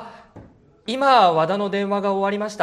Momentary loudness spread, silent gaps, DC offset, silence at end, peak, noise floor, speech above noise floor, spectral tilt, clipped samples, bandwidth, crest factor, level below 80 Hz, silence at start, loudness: 11 LU; none; under 0.1%; 0 s; -2 dBFS; -48 dBFS; 29 dB; -5.5 dB/octave; under 0.1%; 11.5 kHz; 18 dB; -62 dBFS; 0 s; -19 LUFS